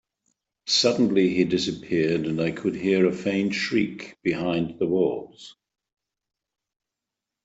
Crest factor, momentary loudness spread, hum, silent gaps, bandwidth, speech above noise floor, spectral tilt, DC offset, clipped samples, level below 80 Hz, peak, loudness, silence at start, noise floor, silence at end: 18 dB; 8 LU; none; none; 8.2 kHz; 63 dB; -5 dB/octave; under 0.1%; under 0.1%; -62 dBFS; -6 dBFS; -24 LUFS; 0.65 s; -87 dBFS; 1.95 s